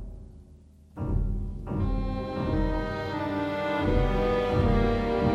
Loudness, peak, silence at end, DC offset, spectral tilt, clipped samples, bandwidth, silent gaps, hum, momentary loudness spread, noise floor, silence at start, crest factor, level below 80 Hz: -28 LUFS; -12 dBFS; 0 s; under 0.1%; -8 dB/octave; under 0.1%; 7.4 kHz; none; none; 10 LU; -52 dBFS; 0 s; 16 dB; -32 dBFS